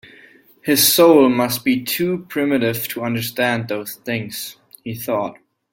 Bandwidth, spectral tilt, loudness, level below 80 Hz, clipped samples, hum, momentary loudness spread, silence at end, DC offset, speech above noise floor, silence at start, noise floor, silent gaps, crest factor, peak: 17 kHz; -4 dB/octave; -18 LUFS; -60 dBFS; under 0.1%; none; 18 LU; 0.4 s; under 0.1%; 31 dB; 0.65 s; -48 dBFS; none; 18 dB; -2 dBFS